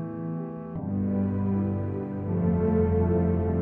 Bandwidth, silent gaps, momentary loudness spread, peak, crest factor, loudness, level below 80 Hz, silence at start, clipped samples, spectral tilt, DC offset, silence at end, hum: 3.1 kHz; none; 10 LU; -12 dBFS; 14 dB; -27 LUFS; -42 dBFS; 0 s; under 0.1%; -13 dB/octave; under 0.1%; 0 s; none